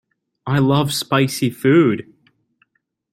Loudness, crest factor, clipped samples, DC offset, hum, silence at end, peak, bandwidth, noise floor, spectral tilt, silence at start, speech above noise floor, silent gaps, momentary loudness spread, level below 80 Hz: -17 LUFS; 16 dB; under 0.1%; under 0.1%; none; 1.1 s; -2 dBFS; 16.5 kHz; -65 dBFS; -6 dB/octave; 0.45 s; 49 dB; none; 9 LU; -56 dBFS